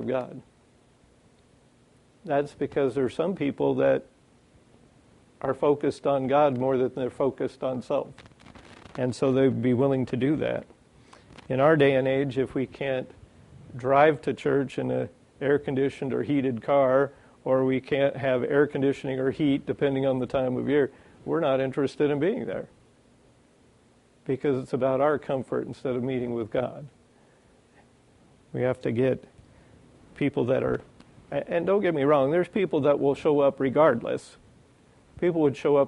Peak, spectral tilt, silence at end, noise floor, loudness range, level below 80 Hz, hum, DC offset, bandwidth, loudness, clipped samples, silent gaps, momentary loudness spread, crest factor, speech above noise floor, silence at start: -6 dBFS; -7.5 dB/octave; 0 s; -60 dBFS; 6 LU; -60 dBFS; none; under 0.1%; 11 kHz; -26 LUFS; under 0.1%; none; 10 LU; 20 dB; 35 dB; 0 s